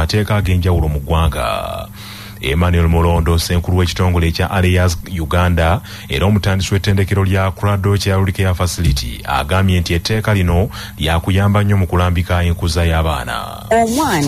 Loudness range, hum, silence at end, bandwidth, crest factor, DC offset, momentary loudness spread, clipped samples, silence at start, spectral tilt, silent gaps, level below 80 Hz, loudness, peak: 1 LU; none; 0 s; 15.5 kHz; 10 dB; 0.2%; 7 LU; under 0.1%; 0 s; -6 dB/octave; none; -24 dBFS; -16 LUFS; -4 dBFS